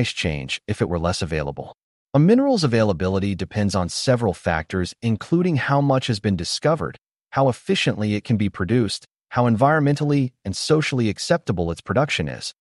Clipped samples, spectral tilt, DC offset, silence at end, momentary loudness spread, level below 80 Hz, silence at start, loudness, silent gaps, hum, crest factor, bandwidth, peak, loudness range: under 0.1%; -6 dB/octave; under 0.1%; 0.1 s; 9 LU; -44 dBFS; 0 s; -21 LUFS; 1.83-2.07 s; none; 16 dB; 11.5 kHz; -6 dBFS; 1 LU